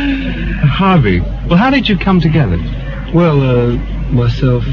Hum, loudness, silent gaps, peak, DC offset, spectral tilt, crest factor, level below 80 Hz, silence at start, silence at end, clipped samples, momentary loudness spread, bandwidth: none; -13 LUFS; none; 0 dBFS; under 0.1%; -8.5 dB/octave; 12 dB; -22 dBFS; 0 s; 0 s; under 0.1%; 8 LU; 6.6 kHz